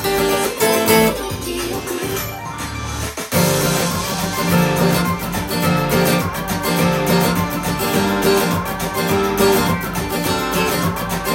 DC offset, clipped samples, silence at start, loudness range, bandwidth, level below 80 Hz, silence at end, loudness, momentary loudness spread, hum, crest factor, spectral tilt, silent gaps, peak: under 0.1%; under 0.1%; 0 s; 2 LU; 17 kHz; -38 dBFS; 0 s; -18 LUFS; 8 LU; none; 16 dB; -4.5 dB/octave; none; -2 dBFS